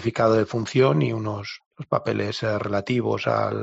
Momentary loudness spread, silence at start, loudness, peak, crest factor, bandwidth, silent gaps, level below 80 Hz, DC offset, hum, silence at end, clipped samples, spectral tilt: 10 LU; 0 s; -23 LUFS; -6 dBFS; 16 dB; 8 kHz; 1.66-1.71 s; -60 dBFS; under 0.1%; none; 0 s; under 0.1%; -5.5 dB/octave